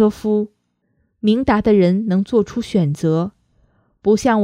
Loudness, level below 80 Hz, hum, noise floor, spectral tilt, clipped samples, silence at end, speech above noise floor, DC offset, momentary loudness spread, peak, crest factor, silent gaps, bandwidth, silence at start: -17 LUFS; -44 dBFS; none; -65 dBFS; -7.5 dB/octave; under 0.1%; 0 s; 50 dB; under 0.1%; 7 LU; 0 dBFS; 16 dB; none; 11 kHz; 0 s